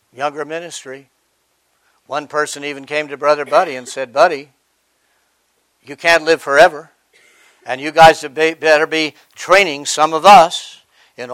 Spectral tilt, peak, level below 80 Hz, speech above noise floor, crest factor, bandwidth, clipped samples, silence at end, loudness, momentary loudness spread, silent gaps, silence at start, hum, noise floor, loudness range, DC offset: -2.5 dB/octave; 0 dBFS; -52 dBFS; 50 dB; 16 dB; 16.5 kHz; 0.4%; 0 s; -13 LUFS; 18 LU; none; 0.2 s; none; -64 dBFS; 9 LU; under 0.1%